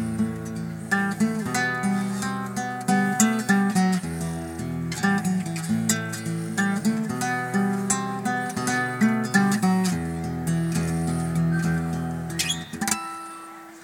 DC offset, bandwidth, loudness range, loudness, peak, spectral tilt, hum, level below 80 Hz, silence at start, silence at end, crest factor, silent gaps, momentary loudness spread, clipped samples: under 0.1%; 17.5 kHz; 2 LU; -25 LUFS; -2 dBFS; -4.5 dB/octave; none; -50 dBFS; 0 s; 0 s; 22 dB; none; 8 LU; under 0.1%